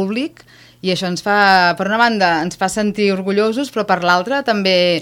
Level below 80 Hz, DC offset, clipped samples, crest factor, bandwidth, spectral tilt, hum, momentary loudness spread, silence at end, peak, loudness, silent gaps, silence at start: -54 dBFS; under 0.1%; under 0.1%; 16 dB; 16.5 kHz; -4.5 dB/octave; none; 9 LU; 0 s; 0 dBFS; -15 LUFS; none; 0 s